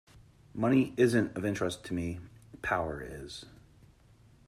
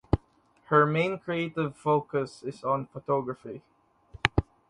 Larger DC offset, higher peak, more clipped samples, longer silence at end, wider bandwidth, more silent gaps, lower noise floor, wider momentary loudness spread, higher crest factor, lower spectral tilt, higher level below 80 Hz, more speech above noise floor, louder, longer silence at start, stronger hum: neither; second, -14 dBFS vs 0 dBFS; neither; first, 0.9 s vs 0.25 s; first, 13.5 kHz vs 11 kHz; neither; about the same, -60 dBFS vs -63 dBFS; first, 18 LU vs 13 LU; second, 20 dB vs 28 dB; about the same, -6 dB/octave vs -7 dB/octave; second, -58 dBFS vs -44 dBFS; second, 30 dB vs 35 dB; second, -31 LUFS vs -28 LUFS; about the same, 0.15 s vs 0.15 s; neither